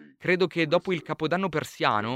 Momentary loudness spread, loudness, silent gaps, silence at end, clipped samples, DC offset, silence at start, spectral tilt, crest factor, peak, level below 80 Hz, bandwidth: 5 LU; -26 LUFS; none; 0 s; under 0.1%; under 0.1%; 0 s; -5.5 dB/octave; 20 dB; -6 dBFS; -64 dBFS; 15.5 kHz